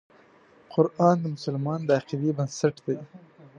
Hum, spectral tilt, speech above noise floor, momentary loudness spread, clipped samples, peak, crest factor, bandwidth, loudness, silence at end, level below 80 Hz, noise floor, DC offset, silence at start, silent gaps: none; -7 dB/octave; 31 dB; 10 LU; under 0.1%; -6 dBFS; 20 dB; 9.6 kHz; -26 LUFS; 0.1 s; -72 dBFS; -56 dBFS; under 0.1%; 0.7 s; none